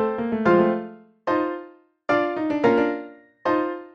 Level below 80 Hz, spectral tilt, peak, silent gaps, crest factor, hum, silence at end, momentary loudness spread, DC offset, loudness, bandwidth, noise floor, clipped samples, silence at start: -60 dBFS; -7.5 dB/octave; -6 dBFS; none; 16 dB; none; 0.05 s; 16 LU; under 0.1%; -23 LUFS; 7 kHz; -45 dBFS; under 0.1%; 0 s